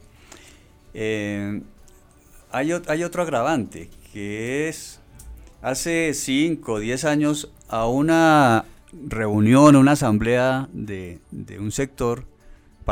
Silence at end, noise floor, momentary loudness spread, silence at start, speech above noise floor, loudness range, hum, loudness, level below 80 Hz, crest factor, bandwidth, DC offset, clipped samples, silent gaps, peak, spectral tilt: 0 s; -50 dBFS; 20 LU; 0.95 s; 30 dB; 9 LU; none; -21 LUFS; -44 dBFS; 18 dB; 16.5 kHz; under 0.1%; under 0.1%; none; -2 dBFS; -5.5 dB/octave